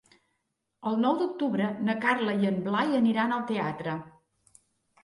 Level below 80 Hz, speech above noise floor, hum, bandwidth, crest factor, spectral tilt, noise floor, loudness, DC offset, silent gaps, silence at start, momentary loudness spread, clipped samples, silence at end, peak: -72 dBFS; 53 dB; none; 11 kHz; 18 dB; -7 dB/octave; -80 dBFS; -28 LUFS; under 0.1%; none; 0.8 s; 9 LU; under 0.1%; 0.95 s; -12 dBFS